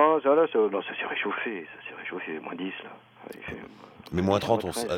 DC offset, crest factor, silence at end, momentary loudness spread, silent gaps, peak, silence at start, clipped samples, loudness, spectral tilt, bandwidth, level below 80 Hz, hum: under 0.1%; 20 dB; 0 s; 21 LU; none; -8 dBFS; 0 s; under 0.1%; -27 LUFS; -5.5 dB/octave; 16.5 kHz; -60 dBFS; none